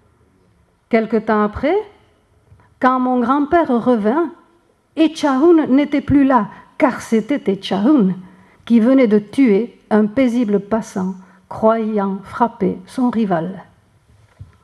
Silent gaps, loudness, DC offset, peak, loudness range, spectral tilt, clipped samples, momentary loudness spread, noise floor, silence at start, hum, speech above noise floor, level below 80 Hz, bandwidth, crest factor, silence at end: none; -16 LUFS; under 0.1%; 0 dBFS; 4 LU; -7 dB/octave; under 0.1%; 10 LU; -56 dBFS; 0.9 s; none; 41 dB; -48 dBFS; 11.5 kHz; 16 dB; 0.2 s